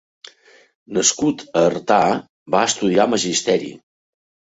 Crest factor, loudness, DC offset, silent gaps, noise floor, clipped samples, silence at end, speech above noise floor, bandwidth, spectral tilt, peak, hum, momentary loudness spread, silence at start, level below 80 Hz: 18 dB; -18 LUFS; under 0.1%; 2.29-2.46 s; -49 dBFS; under 0.1%; 0.75 s; 31 dB; 8.2 kHz; -3 dB/octave; -2 dBFS; none; 6 LU; 0.9 s; -58 dBFS